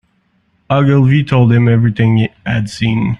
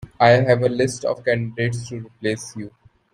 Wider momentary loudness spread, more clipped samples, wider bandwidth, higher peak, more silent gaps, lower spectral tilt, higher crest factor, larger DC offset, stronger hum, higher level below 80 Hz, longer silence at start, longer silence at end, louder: second, 7 LU vs 18 LU; neither; second, 9.2 kHz vs 11.5 kHz; about the same, -2 dBFS vs -2 dBFS; neither; first, -8 dB/octave vs -5.5 dB/octave; second, 10 dB vs 18 dB; neither; neither; first, -40 dBFS vs -56 dBFS; first, 0.7 s vs 0 s; second, 0.05 s vs 0.45 s; first, -12 LUFS vs -20 LUFS